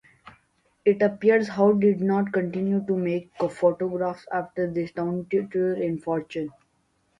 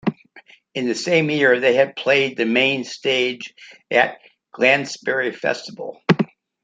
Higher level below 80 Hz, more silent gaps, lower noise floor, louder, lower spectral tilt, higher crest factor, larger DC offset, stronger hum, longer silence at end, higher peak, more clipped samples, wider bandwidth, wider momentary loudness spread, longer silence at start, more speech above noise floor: about the same, -64 dBFS vs -66 dBFS; neither; first, -69 dBFS vs -49 dBFS; second, -25 LUFS vs -19 LUFS; first, -8.5 dB/octave vs -4.5 dB/octave; about the same, 18 dB vs 20 dB; neither; neither; first, 0.7 s vs 0.4 s; second, -8 dBFS vs 0 dBFS; neither; about the same, 10 kHz vs 9.4 kHz; about the same, 9 LU vs 11 LU; first, 0.25 s vs 0.05 s; first, 45 dB vs 30 dB